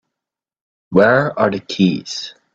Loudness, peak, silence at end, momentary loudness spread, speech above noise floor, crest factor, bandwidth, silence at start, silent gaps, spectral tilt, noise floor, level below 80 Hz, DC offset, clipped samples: -16 LUFS; 0 dBFS; 0.25 s; 13 LU; 70 dB; 18 dB; 7.8 kHz; 0.9 s; none; -6 dB/octave; -85 dBFS; -56 dBFS; under 0.1%; under 0.1%